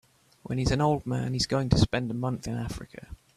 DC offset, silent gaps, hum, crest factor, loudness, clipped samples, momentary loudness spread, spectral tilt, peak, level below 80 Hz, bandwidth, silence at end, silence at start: under 0.1%; none; none; 22 dB; -28 LUFS; under 0.1%; 14 LU; -6 dB/octave; -6 dBFS; -42 dBFS; 13.5 kHz; 0.2 s; 0.5 s